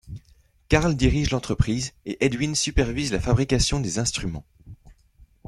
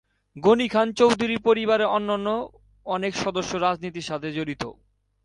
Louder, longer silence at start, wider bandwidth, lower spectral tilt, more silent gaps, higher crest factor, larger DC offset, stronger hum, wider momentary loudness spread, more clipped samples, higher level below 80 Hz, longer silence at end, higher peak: about the same, -23 LUFS vs -23 LUFS; second, 0.05 s vs 0.35 s; about the same, 12.5 kHz vs 11.5 kHz; about the same, -4.5 dB/octave vs -5 dB/octave; neither; about the same, 22 dB vs 18 dB; neither; neither; about the same, 10 LU vs 11 LU; neither; first, -34 dBFS vs -56 dBFS; second, 0.25 s vs 0.5 s; first, -2 dBFS vs -6 dBFS